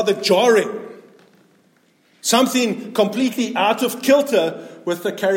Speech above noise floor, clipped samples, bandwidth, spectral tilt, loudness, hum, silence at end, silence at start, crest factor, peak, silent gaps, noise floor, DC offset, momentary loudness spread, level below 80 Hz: 40 dB; under 0.1%; 17 kHz; -3.5 dB/octave; -18 LUFS; none; 0 s; 0 s; 16 dB; -2 dBFS; none; -58 dBFS; under 0.1%; 11 LU; -74 dBFS